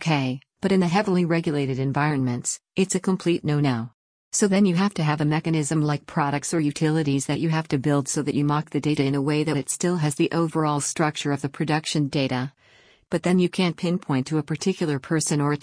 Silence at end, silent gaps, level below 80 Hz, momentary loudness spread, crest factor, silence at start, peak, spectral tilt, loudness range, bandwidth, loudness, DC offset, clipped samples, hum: 0.05 s; 3.94-4.31 s; -60 dBFS; 5 LU; 16 dB; 0 s; -8 dBFS; -5.5 dB/octave; 2 LU; 10.5 kHz; -23 LUFS; under 0.1%; under 0.1%; none